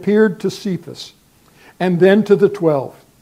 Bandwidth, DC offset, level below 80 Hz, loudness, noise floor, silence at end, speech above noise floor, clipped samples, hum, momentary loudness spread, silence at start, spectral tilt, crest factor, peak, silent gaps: 15 kHz; under 0.1%; -62 dBFS; -16 LUFS; -49 dBFS; 0.3 s; 34 dB; under 0.1%; none; 20 LU; 0 s; -7 dB/octave; 16 dB; 0 dBFS; none